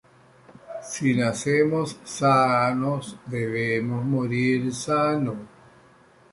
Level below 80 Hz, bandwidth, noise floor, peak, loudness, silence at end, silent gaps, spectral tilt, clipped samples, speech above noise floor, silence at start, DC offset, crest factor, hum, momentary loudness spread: -62 dBFS; 11.5 kHz; -55 dBFS; -8 dBFS; -24 LUFS; 0.85 s; none; -6 dB/octave; under 0.1%; 31 dB; 0.5 s; under 0.1%; 18 dB; none; 11 LU